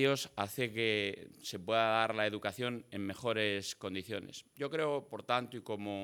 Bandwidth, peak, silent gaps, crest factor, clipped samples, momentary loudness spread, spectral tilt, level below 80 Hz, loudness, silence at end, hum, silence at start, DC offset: 19 kHz; -14 dBFS; none; 22 dB; under 0.1%; 11 LU; -4 dB/octave; -80 dBFS; -36 LUFS; 0 s; none; 0 s; under 0.1%